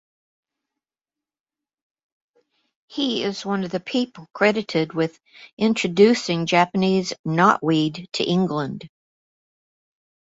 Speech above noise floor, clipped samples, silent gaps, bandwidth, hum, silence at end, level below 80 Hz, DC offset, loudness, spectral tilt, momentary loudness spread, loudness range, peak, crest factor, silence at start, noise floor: over 69 dB; under 0.1%; 5.53-5.57 s, 7.19-7.24 s; 8 kHz; none; 1.35 s; -64 dBFS; under 0.1%; -21 LUFS; -5.5 dB/octave; 9 LU; 10 LU; -2 dBFS; 20 dB; 2.9 s; under -90 dBFS